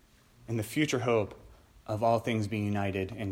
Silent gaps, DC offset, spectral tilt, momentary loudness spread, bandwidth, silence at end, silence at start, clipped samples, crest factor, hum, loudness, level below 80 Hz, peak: none; under 0.1%; -6 dB/octave; 10 LU; 16.5 kHz; 0 s; 0.45 s; under 0.1%; 18 dB; none; -31 LUFS; -60 dBFS; -12 dBFS